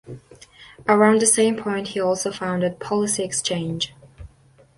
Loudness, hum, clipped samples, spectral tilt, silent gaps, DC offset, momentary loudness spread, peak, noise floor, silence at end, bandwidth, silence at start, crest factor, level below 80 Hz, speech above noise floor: -21 LUFS; none; under 0.1%; -3.5 dB/octave; none; under 0.1%; 13 LU; -4 dBFS; -54 dBFS; 0.5 s; 11.5 kHz; 0.05 s; 18 dB; -54 dBFS; 34 dB